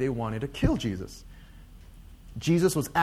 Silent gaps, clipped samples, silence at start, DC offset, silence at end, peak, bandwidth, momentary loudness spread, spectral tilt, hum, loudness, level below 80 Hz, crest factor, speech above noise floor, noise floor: none; under 0.1%; 0 s; under 0.1%; 0 s; -10 dBFS; 15.5 kHz; 19 LU; -6 dB/octave; none; -28 LUFS; -42 dBFS; 18 dB; 21 dB; -48 dBFS